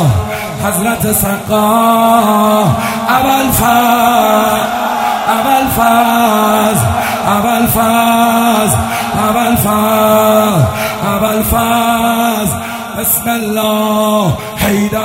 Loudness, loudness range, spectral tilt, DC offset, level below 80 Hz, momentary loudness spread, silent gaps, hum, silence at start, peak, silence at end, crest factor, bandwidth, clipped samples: -11 LUFS; 2 LU; -4.5 dB/octave; under 0.1%; -34 dBFS; 6 LU; none; none; 0 s; 0 dBFS; 0 s; 10 dB; 16.5 kHz; under 0.1%